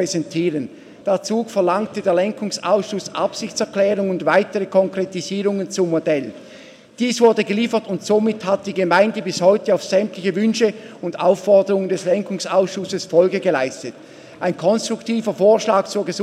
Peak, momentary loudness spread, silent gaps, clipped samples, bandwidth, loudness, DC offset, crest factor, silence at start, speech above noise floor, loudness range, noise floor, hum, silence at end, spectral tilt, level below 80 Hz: -2 dBFS; 8 LU; none; under 0.1%; 13.5 kHz; -19 LUFS; under 0.1%; 18 dB; 0 s; 24 dB; 3 LU; -42 dBFS; none; 0 s; -5 dB/octave; -70 dBFS